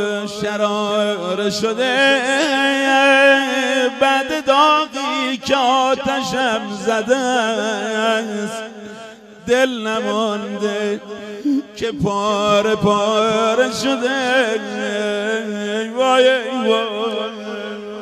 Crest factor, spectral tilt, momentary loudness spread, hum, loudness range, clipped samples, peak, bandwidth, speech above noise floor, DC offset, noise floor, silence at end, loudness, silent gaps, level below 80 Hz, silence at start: 18 dB; -3.5 dB/octave; 11 LU; none; 6 LU; under 0.1%; 0 dBFS; 14 kHz; 20 dB; under 0.1%; -37 dBFS; 0 s; -17 LUFS; none; -56 dBFS; 0 s